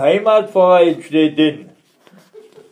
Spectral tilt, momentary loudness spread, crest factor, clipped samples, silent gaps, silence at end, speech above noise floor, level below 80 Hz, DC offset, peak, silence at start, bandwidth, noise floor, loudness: -6.5 dB/octave; 6 LU; 14 dB; under 0.1%; none; 1.1 s; 36 dB; -72 dBFS; under 0.1%; 0 dBFS; 0 s; 9.6 kHz; -49 dBFS; -13 LUFS